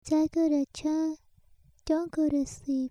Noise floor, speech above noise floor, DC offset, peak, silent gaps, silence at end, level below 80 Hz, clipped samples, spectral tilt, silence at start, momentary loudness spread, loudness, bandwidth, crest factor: -60 dBFS; 32 dB; under 0.1%; -16 dBFS; none; 0 s; -56 dBFS; under 0.1%; -5.5 dB/octave; 0.05 s; 7 LU; -29 LUFS; 11 kHz; 14 dB